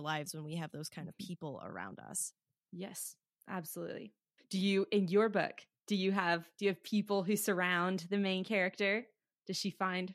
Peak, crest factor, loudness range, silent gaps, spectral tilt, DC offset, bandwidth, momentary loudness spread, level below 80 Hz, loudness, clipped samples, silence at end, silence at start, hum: -16 dBFS; 20 dB; 10 LU; none; -4.5 dB/octave; under 0.1%; 15.5 kHz; 14 LU; -88 dBFS; -36 LUFS; under 0.1%; 0 s; 0 s; none